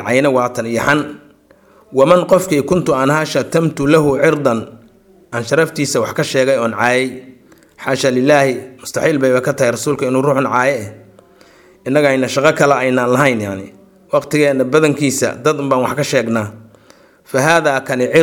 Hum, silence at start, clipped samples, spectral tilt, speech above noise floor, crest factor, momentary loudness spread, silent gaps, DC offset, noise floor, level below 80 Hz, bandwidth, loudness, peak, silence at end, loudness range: none; 0 s; under 0.1%; -5 dB/octave; 34 dB; 14 dB; 10 LU; none; under 0.1%; -48 dBFS; -52 dBFS; 19 kHz; -14 LUFS; 0 dBFS; 0 s; 2 LU